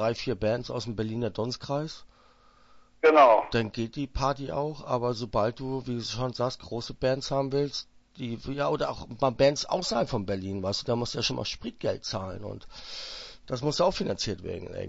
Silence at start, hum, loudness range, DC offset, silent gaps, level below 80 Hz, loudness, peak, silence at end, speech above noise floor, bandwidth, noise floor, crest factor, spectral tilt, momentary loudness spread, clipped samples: 0 s; none; 6 LU; under 0.1%; none; -50 dBFS; -28 LUFS; -6 dBFS; 0 s; 30 dB; 8 kHz; -59 dBFS; 22 dB; -5 dB/octave; 13 LU; under 0.1%